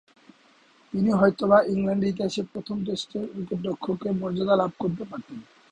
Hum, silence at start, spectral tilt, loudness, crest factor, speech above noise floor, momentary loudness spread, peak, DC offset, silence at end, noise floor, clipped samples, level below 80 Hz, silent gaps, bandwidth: none; 0.95 s; -7 dB/octave; -25 LUFS; 20 dB; 34 dB; 14 LU; -6 dBFS; under 0.1%; 0.3 s; -58 dBFS; under 0.1%; -60 dBFS; none; 9.4 kHz